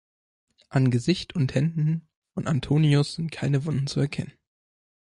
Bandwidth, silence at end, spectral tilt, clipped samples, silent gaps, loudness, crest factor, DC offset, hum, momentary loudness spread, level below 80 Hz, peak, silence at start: 11 kHz; 0.85 s; -7 dB/octave; under 0.1%; 2.16-2.22 s; -25 LUFS; 16 dB; under 0.1%; none; 11 LU; -54 dBFS; -10 dBFS; 0.7 s